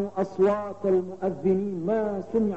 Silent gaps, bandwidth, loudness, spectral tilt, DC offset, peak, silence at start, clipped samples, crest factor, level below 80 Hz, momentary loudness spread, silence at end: none; 7.8 kHz; -26 LUFS; -9 dB/octave; 0.3%; -12 dBFS; 0 s; under 0.1%; 14 dB; -62 dBFS; 4 LU; 0 s